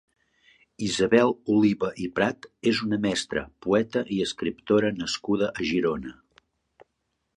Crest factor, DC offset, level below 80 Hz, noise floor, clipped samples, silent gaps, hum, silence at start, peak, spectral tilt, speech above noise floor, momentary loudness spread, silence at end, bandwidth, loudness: 20 dB; under 0.1%; -56 dBFS; -77 dBFS; under 0.1%; none; none; 0.8 s; -6 dBFS; -5 dB/octave; 53 dB; 9 LU; 1.25 s; 11 kHz; -25 LUFS